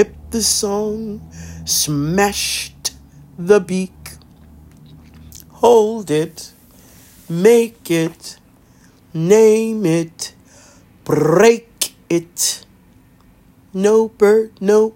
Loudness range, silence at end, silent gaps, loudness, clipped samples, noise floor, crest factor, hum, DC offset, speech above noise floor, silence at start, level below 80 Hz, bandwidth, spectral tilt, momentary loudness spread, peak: 4 LU; 0.05 s; none; -16 LUFS; under 0.1%; -49 dBFS; 16 dB; none; under 0.1%; 34 dB; 0 s; -48 dBFS; 16.5 kHz; -4 dB/octave; 18 LU; 0 dBFS